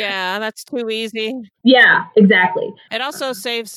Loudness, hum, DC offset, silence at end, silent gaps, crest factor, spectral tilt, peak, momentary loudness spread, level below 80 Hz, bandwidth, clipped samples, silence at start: -15 LUFS; none; under 0.1%; 0 s; none; 16 dB; -4.5 dB/octave; 0 dBFS; 15 LU; -74 dBFS; 15 kHz; under 0.1%; 0 s